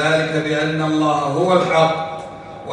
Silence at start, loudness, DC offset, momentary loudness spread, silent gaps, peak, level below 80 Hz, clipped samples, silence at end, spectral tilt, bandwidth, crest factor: 0 s; -18 LUFS; under 0.1%; 15 LU; none; -2 dBFS; -56 dBFS; under 0.1%; 0 s; -5.5 dB/octave; 11 kHz; 16 dB